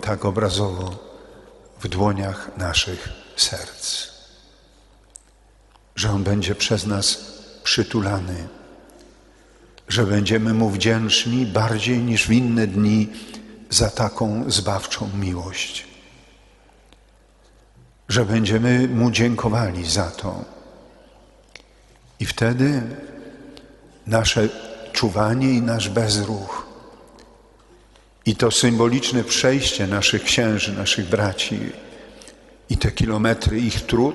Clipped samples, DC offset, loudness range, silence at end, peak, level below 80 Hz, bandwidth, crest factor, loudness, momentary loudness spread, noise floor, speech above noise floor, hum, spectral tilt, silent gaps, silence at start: under 0.1%; under 0.1%; 7 LU; 0 s; -2 dBFS; -40 dBFS; 11.5 kHz; 20 dB; -20 LUFS; 15 LU; -53 dBFS; 33 dB; none; -4.5 dB/octave; none; 0 s